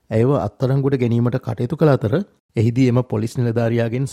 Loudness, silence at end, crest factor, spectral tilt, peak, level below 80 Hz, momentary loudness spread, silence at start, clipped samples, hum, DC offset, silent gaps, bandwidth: -19 LUFS; 0 s; 16 dB; -8.5 dB/octave; -2 dBFS; -52 dBFS; 7 LU; 0.1 s; under 0.1%; none; under 0.1%; 2.40-2.49 s; 12 kHz